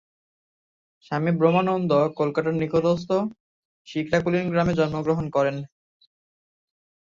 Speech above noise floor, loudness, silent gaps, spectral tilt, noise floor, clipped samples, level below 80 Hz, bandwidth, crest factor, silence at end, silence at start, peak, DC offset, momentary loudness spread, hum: over 68 dB; -23 LUFS; 3.40-3.85 s; -7.5 dB/octave; under -90 dBFS; under 0.1%; -54 dBFS; 7.4 kHz; 18 dB; 1.4 s; 1.1 s; -6 dBFS; under 0.1%; 11 LU; none